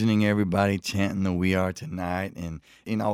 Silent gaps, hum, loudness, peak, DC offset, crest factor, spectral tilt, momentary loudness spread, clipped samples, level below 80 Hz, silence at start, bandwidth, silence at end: none; none; -26 LUFS; -8 dBFS; under 0.1%; 18 dB; -6.5 dB/octave; 12 LU; under 0.1%; -52 dBFS; 0 s; 15.5 kHz; 0 s